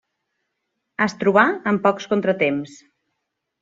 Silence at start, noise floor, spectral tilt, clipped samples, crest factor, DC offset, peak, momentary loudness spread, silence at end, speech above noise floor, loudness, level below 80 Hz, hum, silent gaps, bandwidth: 1 s; -78 dBFS; -6 dB/octave; under 0.1%; 20 dB; under 0.1%; -2 dBFS; 12 LU; 0.9 s; 59 dB; -19 LUFS; -66 dBFS; none; none; 7.8 kHz